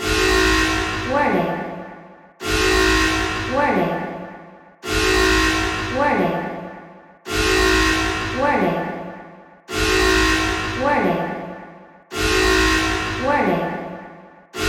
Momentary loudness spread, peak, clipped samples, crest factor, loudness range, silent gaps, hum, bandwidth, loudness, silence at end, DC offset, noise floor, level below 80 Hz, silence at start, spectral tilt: 18 LU; -4 dBFS; under 0.1%; 16 dB; 2 LU; none; none; 16.5 kHz; -18 LUFS; 0 s; under 0.1%; -42 dBFS; -32 dBFS; 0 s; -3.5 dB/octave